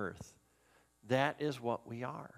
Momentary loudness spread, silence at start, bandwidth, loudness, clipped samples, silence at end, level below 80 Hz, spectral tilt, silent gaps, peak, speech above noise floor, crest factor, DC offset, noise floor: 16 LU; 0 s; 15.5 kHz; -37 LUFS; under 0.1%; 0 s; -72 dBFS; -6 dB/octave; none; -16 dBFS; 33 dB; 24 dB; under 0.1%; -70 dBFS